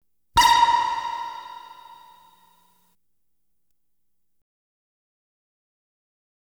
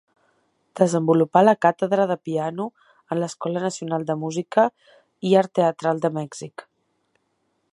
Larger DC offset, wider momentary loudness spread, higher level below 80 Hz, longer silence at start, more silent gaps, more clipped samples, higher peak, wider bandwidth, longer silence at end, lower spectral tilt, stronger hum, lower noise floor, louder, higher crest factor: neither; first, 24 LU vs 14 LU; first, -50 dBFS vs -74 dBFS; second, 0.35 s vs 0.75 s; neither; neither; second, -6 dBFS vs -2 dBFS; first, over 20 kHz vs 11.5 kHz; first, 4.45 s vs 1.1 s; second, -0.5 dB/octave vs -6.5 dB/octave; neither; first, -80 dBFS vs -71 dBFS; about the same, -20 LUFS vs -22 LUFS; about the same, 22 dB vs 20 dB